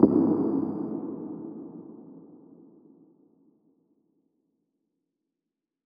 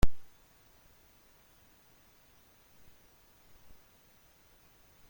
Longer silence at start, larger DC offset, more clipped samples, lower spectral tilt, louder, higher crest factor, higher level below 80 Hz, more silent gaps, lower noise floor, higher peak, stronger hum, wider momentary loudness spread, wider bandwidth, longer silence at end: about the same, 0 s vs 0.05 s; neither; neither; first, -13 dB/octave vs -5.5 dB/octave; first, -28 LUFS vs -53 LUFS; about the same, 28 dB vs 24 dB; second, -66 dBFS vs -44 dBFS; neither; first, -87 dBFS vs -63 dBFS; first, -4 dBFS vs -10 dBFS; neither; first, 25 LU vs 1 LU; second, 1.9 kHz vs 17 kHz; second, 3.5 s vs 4.9 s